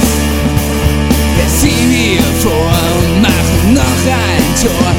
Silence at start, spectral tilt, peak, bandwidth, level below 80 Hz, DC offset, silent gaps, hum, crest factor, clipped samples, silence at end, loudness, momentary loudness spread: 0 s; -4.5 dB/octave; 0 dBFS; 18 kHz; -18 dBFS; under 0.1%; none; none; 10 dB; 0.1%; 0 s; -11 LUFS; 3 LU